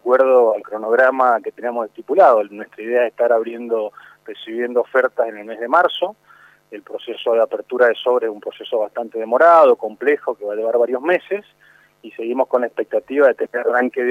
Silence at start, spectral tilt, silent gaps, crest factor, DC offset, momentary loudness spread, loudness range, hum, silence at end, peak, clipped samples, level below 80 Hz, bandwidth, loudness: 0.05 s; -5 dB/octave; none; 16 dB; under 0.1%; 16 LU; 5 LU; 50 Hz at -70 dBFS; 0 s; 0 dBFS; under 0.1%; -76 dBFS; 6 kHz; -17 LUFS